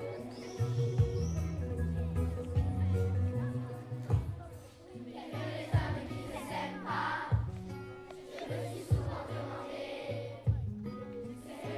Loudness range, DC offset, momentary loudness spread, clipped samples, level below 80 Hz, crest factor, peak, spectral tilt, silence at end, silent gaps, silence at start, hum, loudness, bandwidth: 4 LU; under 0.1%; 12 LU; under 0.1%; -46 dBFS; 18 dB; -18 dBFS; -7 dB/octave; 0 s; none; 0 s; none; -36 LUFS; 13 kHz